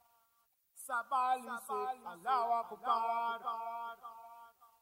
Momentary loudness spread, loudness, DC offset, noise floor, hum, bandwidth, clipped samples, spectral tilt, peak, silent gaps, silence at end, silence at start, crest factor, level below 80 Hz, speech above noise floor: 18 LU; -37 LUFS; under 0.1%; -76 dBFS; none; 16 kHz; under 0.1%; -2 dB/octave; -20 dBFS; none; 0.15 s; 0.75 s; 18 dB; -88 dBFS; 40 dB